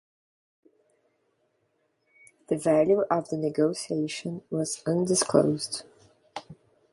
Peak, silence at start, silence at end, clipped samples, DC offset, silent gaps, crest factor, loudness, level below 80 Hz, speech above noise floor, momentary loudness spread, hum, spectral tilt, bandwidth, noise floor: -6 dBFS; 2.5 s; 0.4 s; under 0.1%; under 0.1%; none; 22 dB; -26 LUFS; -68 dBFS; 47 dB; 15 LU; none; -5 dB/octave; 11.5 kHz; -73 dBFS